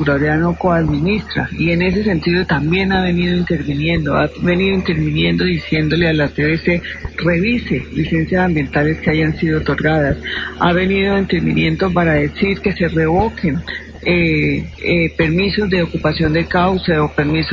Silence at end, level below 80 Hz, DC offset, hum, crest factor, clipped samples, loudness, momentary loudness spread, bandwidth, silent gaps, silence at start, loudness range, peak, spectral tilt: 0 s; -30 dBFS; 0.2%; none; 14 dB; under 0.1%; -16 LUFS; 4 LU; 7 kHz; none; 0 s; 1 LU; -2 dBFS; -8 dB/octave